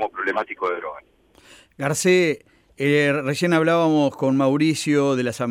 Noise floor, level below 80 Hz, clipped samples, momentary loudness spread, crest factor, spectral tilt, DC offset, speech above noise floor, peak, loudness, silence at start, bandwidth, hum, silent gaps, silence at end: -51 dBFS; -64 dBFS; under 0.1%; 8 LU; 14 dB; -5 dB/octave; under 0.1%; 31 dB; -6 dBFS; -20 LUFS; 0 s; 16 kHz; none; none; 0 s